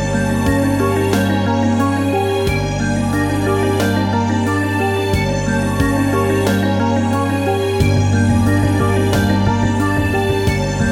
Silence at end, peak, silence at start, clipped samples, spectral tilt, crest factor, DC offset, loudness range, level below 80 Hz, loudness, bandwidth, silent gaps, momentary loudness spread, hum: 0 s; -2 dBFS; 0 s; under 0.1%; -6 dB/octave; 14 dB; under 0.1%; 1 LU; -30 dBFS; -16 LUFS; 16 kHz; none; 3 LU; 50 Hz at -40 dBFS